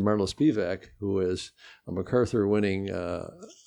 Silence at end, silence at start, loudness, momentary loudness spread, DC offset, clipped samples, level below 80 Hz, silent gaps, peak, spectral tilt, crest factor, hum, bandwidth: 0.15 s; 0 s; -28 LUFS; 12 LU; under 0.1%; under 0.1%; -56 dBFS; none; -12 dBFS; -6.5 dB/octave; 16 dB; none; 11.5 kHz